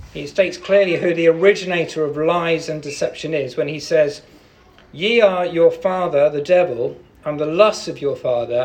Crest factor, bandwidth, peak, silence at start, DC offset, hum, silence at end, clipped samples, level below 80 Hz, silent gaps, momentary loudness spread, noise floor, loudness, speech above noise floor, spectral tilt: 18 dB; 9.4 kHz; 0 dBFS; 0 s; under 0.1%; none; 0 s; under 0.1%; -54 dBFS; none; 9 LU; -49 dBFS; -18 LUFS; 31 dB; -5 dB/octave